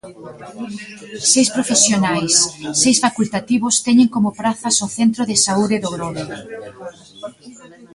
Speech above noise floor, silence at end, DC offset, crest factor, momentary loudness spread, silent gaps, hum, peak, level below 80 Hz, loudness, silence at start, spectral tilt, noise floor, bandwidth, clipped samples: 23 dB; 0.1 s; under 0.1%; 18 dB; 21 LU; none; none; 0 dBFS; -56 dBFS; -15 LUFS; 0.05 s; -2.5 dB/octave; -41 dBFS; 11.5 kHz; under 0.1%